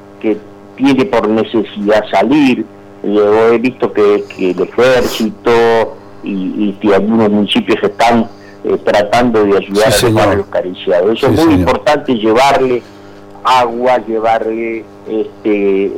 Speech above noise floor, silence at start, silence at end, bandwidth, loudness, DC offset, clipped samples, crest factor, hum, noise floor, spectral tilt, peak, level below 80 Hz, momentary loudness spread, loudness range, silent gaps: 23 dB; 0.05 s; 0 s; 18 kHz; -12 LUFS; under 0.1%; under 0.1%; 8 dB; none; -34 dBFS; -5.5 dB/octave; -4 dBFS; -40 dBFS; 10 LU; 2 LU; none